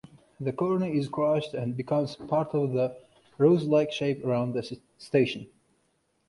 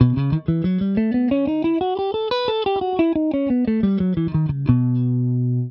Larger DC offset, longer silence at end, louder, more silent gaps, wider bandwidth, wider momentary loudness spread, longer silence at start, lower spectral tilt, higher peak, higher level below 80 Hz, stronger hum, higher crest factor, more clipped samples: neither; first, 0.8 s vs 0 s; second, -27 LUFS vs -20 LUFS; neither; first, 11.5 kHz vs 5.8 kHz; first, 11 LU vs 3 LU; first, 0.4 s vs 0 s; second, -7.5 dB/octave vs -10.5 dB/octave; second, -10 dBFS vs 0 dBFS; second, -66 dBFS vs -42 dBFS; neither; about the same, 18 dB vs 18 dB; neither